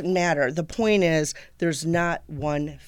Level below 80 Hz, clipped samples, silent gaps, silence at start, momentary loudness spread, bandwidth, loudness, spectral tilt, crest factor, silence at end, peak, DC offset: -50 dBFS; under 0.1%; none; 0 s; 8 LU; 17 kHz; -24 LUFS; -5 dB/octave; 14 dB; 0 s; -10 dBFS; under 0.1%